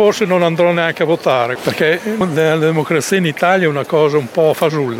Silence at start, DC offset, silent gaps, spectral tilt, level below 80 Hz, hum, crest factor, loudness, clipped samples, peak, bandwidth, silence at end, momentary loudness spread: 0 s; under 0.1%; none; -5.5 dB/octave; -60 dBFS; none; 12 dB; -14 LUFS; under 0.1%; -2 dBFS; 17 kHz; 0 s; 3 LU